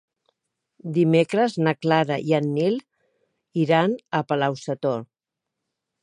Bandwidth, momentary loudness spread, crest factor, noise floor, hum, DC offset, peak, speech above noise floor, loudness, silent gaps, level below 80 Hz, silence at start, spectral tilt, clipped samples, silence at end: 10.5 kHz; 8 LU; 18 dB; -85 dBFS; none; under 0.1%; -4 dBFS; 63 dB; -23 LUFS; none; -72 dBFS; 0.85 s; -7 dB/octave; under 0.1%; 1 s